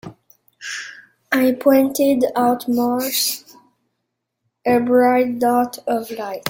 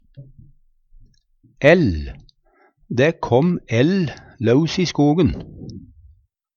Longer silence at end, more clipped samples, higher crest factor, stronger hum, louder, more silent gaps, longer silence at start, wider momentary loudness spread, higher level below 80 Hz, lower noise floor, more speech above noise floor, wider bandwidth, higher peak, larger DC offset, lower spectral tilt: second, 0 s vs 0.7 s; neither; about the same, 18 dB vs 20 dB; neither; about the same, -18 LUFS vs -18 LUFS; neither; second, 0.05 s vs 0.2 s; second, 14 LU vs 19 LU; second, -62 dBFS vs -40 dBFS; first, -76 dBFS vs -59 dBFS; first, 59 dB vs 42 dB; first, 17 kHz vs 7.2 kHz; about the same, -2 dBFS vs 0 dBFS; neither; second, -3.5 dB/octave vs -7 dB/octave